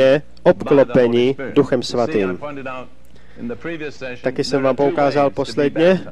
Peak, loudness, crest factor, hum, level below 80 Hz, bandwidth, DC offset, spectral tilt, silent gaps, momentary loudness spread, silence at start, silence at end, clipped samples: -2 dBFS; -17 LUFS; 16 dB; none; -50 dBFS; 11 kHz; 2%; -6.5 dB/octave; none; 14 LU; 0 s; 0 s; under 0.1%